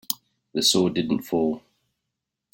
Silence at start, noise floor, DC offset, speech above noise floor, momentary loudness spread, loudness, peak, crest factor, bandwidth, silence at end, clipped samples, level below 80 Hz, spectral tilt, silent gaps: 0.1 s; -83 dBFS; under 0.1%; 60 dB; 12 LU; -23 LUFS; -4 dBFS; 22 dB; 17 kHz; 0.95 s; under 0.1%; -62 dBFS; -4 dB/octave; none